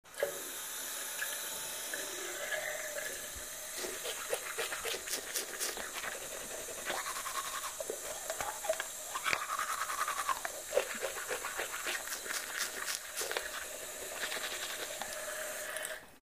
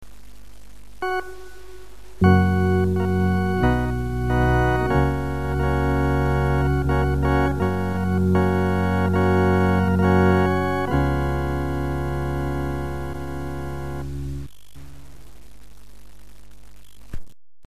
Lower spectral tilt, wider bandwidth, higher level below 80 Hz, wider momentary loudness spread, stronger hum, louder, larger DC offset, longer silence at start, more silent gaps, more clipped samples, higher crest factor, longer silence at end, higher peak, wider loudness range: second, 0.5 dB/octave vs -8 dB/octave; first, 15.5 kHz vs 14 kHz; second, -68 dBFS vs -32 dBFS; second, 5 LU vs 13 LU; neither; second, -37 LUFS vs -22 LUFS; second, under 0.1% vs 2%; about the same, 0.05 s vs 0 s; neither; neither; first, 28 dB vs 18 dB; second, 0.05 s vs 0.4 s; second, -12 dBFS vs -4 dBFS; second, 2 LU vs 13 LU